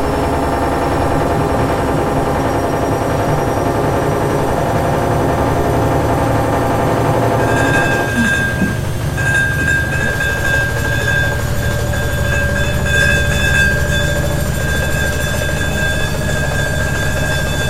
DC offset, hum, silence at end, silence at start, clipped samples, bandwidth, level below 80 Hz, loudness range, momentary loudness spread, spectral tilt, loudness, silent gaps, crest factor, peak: under 0.1%; none; 0 s; 0 s; under 0.1%; 16 kHz; -24 dBFS; 1 LU; 4 LU; -5 dB/octave; -15 LUFS; none; 14 dB; -2 dBFS